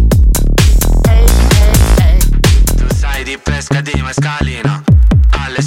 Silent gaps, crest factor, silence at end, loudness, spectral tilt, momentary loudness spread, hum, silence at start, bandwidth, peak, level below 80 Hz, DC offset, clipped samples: none; 8 dB; 0 s; -11 LUFS; -5 dB/octave; 7 LU; none; 0 s; 17 kHz; 0 dBFS; -10 dBFS; under 0.1%; under 0.1%